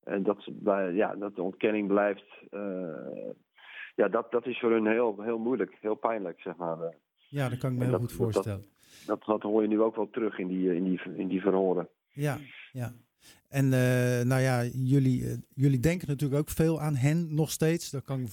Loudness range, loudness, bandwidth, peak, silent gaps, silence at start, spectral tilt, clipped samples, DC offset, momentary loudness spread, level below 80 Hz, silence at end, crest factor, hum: 4 LU; -29 LUFS; 17.5 kHz; -10 dBFS; none; 0.05 s; -7 dB/octave; under 0.1%; under 0.1%; 13 LU; -58 dBFS; 0 s; 18 dB; none